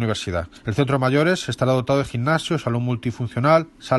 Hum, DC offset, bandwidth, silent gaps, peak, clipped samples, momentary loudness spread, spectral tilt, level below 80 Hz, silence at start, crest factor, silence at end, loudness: none; under 0.1%; 12 kHz; none; -4 dBFS; under 0.1%; 8 LU; -6 dB/octave; -48 dBFS; 0 s; 18 dB; 0 s; -21 LUFS